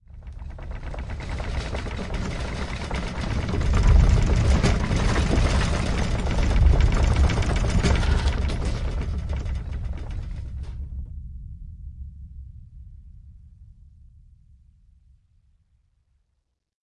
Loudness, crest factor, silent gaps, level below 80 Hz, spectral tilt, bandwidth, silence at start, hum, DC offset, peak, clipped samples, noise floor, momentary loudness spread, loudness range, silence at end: -25 LUFS; 18 dB; none; -26 dBFS; -6 dB/octave; 11 kHz; 0.1 s; none; under 0.1%; -6 dBFS; under 0.1%; -74 dBFS; 20 LU; 18 LU; 3.25 s